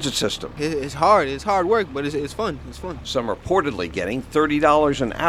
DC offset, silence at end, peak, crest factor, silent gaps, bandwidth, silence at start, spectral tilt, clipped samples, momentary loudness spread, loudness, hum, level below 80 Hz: under 0.1%; 0 s; -2 dBFS; 18 dB; none; 15.5 kHz; 0 s; -4.5 dB/octave; under 0.1%; 10 LU; -21 LUFS; none; -42 dBFS